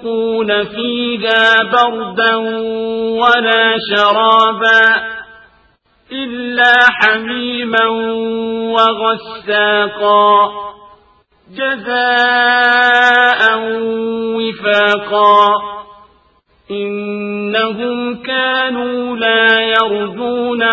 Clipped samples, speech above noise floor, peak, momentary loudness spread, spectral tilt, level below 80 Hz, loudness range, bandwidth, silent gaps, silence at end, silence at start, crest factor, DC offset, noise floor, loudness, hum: 0.1%; 41 dB; 0 dBFS; 12 LU; -4.5 dB/octave; -56 dBFS; 4 LU; 8 kHz; none; 0 s; 0 s; 14 dB; under 0.1%; -54 dBFS; -12 LUFS; none